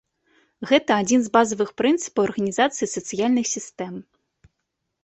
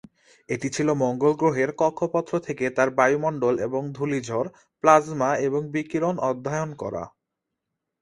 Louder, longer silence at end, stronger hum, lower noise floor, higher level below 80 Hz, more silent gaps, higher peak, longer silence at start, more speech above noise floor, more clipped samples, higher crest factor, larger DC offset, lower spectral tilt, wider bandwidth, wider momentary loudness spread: first, -21 LUFS vs -24 LUFS; about the same, 1 s vs 0.95 s; neither; second, -78 dBFS vs -83 dBFS; about the same, -64 dBFS vs -62 dBFS; neither; about the same, -2 dBFS vs -2 dBFS; about the same, 0.6 s vs 0.5 s; about the same, 57 dB vs 59 dB; neither; about the same, 20 dB vs 24 dB; neither; second, -3.5 dB/octave vs -6 dB/octave; second, 8.4 kHz vs 11.5 kHz; first, 14 LU vs 10 LU